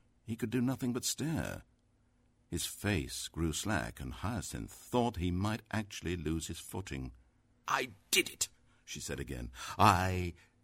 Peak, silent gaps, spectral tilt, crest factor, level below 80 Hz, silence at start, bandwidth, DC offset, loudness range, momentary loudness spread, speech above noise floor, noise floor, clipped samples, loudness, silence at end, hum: -10 dBFS; none; -4 dB/octave; 26 dB; -52 dBFS; 0.25 s; 16 kHz; under 0.1%; 5 LU; 13 LU; 36 dB; -71 dBFS; under 0.1%; -35 LUFS; 0.3 s; none